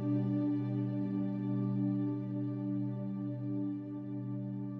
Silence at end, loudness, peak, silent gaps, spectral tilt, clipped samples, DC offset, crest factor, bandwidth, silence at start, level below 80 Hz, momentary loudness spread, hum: 0 s; -36 LUFS; -24 dBFS; none; -12 dB/octave; under 0.1%; under 0.1%; 12 dB; 4.3 kHz; 0 s; -76 dBFS; 6 LU; none